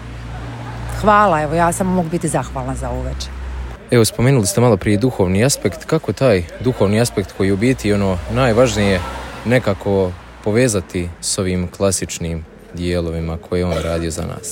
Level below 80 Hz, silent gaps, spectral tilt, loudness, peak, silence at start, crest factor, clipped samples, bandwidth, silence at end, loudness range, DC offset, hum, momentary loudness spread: -32 dBFS; none; -5.5 dB/octave; -17 LUFS; 0 dBFS; 0 s; 16 dB; under 0.1%; 17 kHz; 0 s; 4 LU; under 0.1%; none; 13 LU